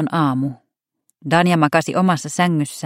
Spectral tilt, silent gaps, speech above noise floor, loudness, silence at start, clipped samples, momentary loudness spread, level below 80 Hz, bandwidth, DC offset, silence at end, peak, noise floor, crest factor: -5.5 dB/octave; none; 51 dB; -18 LUFS; 0 s; under 0.1%; 9 LU; -62 dBFS; 15.5 kHz; under 0.1%; 0 s; 0 dBFS; -69 dBFS; 18 dB